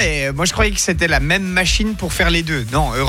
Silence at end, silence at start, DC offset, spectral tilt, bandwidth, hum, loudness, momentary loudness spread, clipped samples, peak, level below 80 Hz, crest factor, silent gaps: 0 s; 0 s; under 0.1%; -3.5 dB/octave; 16.5 kHz; none; -16 LUFS; 4 LU; under 0.1%; -4 dBFS; -24 dBFS; 14 dB; none